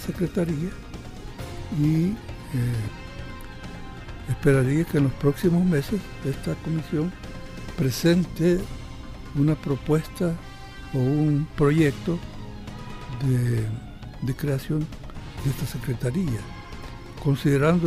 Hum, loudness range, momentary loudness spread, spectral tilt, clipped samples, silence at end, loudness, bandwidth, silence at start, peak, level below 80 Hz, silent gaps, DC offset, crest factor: none; 5 LU; 18 LU; -7.5 dB/octave; under 0.1%; 0 s; -25 LUFS; 15.5 kHz; 0 s; -8 dBFS; -40 dBFS; none; under 0.1%; 16 dB